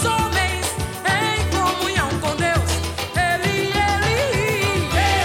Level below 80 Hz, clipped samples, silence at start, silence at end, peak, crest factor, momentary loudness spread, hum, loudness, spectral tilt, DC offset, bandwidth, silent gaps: -32 dBFS; under 0.1%; 0 s; 0 s; -6 dBFS; 14 dB; 4 LU; none; -20 LUFS; -4 dB/octave; under 0.1%; 17 kHz; none